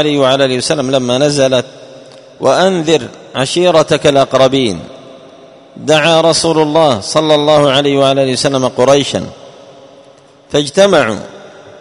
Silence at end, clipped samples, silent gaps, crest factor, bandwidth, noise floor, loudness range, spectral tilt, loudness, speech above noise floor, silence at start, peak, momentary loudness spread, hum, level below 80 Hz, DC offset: 0.1 s; 0.3%; none; 12 dB; 11 kHz; -42 dBFS; 3 LU; -4.5 dB/octave; -11 LUFS; 31 dB; 0 s; 0 dBFS; 9 LU; none; -48 dBFS; under 0.1%